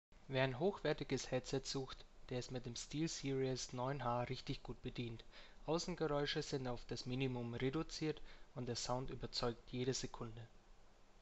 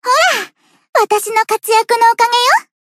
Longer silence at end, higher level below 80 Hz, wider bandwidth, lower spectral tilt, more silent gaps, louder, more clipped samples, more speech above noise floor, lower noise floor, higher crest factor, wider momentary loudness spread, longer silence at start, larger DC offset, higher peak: second, 0 s vs 0.3 s; first, -58 dBFS vs -72 dBFS; second, 8.2 kHz vs 16 kHz; first, -5 dB/octave vs 1 dB/octave; second, none vs 0.89-0.93 s; second, -43 LUFS vs -12 LUFS; neither; about the same, 20 dB vs 19 dB; first, -63 dBFS vs -32 dBFS; first, 20 dB vs 14 dB; first, 11 LU vs 7 LU; about the same, 0.1 s vs 0.05 s; neither; second, -24 dBFS vs 0 dBFS